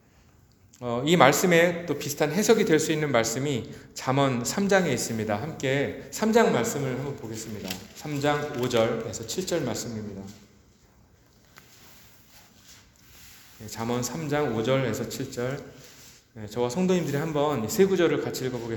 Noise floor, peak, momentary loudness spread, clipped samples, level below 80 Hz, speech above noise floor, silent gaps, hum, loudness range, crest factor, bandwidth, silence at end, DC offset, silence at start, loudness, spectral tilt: -58 dBFS; 0 dBFS; 15 LU; under 0.1%; -60 dBFS; 33 dB; none; none; 12 LU; 26 dB; over 20 kHz; 0 s; under 0.1%; 0.8 s; -26 LUFS; -4.5 dB/octave